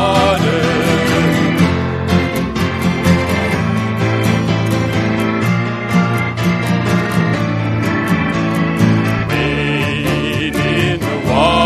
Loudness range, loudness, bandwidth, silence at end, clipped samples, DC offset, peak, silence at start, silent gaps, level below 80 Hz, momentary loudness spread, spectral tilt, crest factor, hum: 1 LU; -15 LUFS; 14 kHz; 0 s; under 0.1%; under 0.1%; 0 dBFS; 0 s; none; -34 dBFS; 3 LU; -6 dB/octave; 14 dB; none